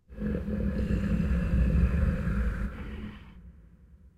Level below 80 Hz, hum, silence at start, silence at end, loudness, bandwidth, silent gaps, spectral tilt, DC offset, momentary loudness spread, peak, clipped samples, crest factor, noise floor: -32 dBFS; none; 0.1 s; 0.55 s; -30 LUFS; 7.6 kHz; none; -9 dB/octave; under 0.1%; 14 LU; -14 dBFS; under 0.1%; 16 dB; -55 dBFS